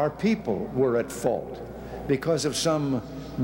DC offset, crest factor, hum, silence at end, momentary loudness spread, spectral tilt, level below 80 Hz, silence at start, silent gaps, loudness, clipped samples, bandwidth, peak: under 0.1%; 16 dB; none; 0 s; 12 LU; -5.5 dB/octave; -50 dBFS; 0 s; none; -26 LUFS; under 0.1%; 17 kHz; -10 dBFS